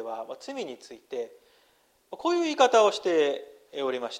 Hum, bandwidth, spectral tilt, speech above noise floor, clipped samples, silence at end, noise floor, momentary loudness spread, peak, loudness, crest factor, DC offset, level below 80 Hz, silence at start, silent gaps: none; 13 kHz; -2.5 dB/octave; 39 dB; under 0.1%; 0 s; -65 dBFS; 20 LU; -8 dBFS; -26 LUFS; 20 dB; under 0.1%; -78 dBFS; 0 s; none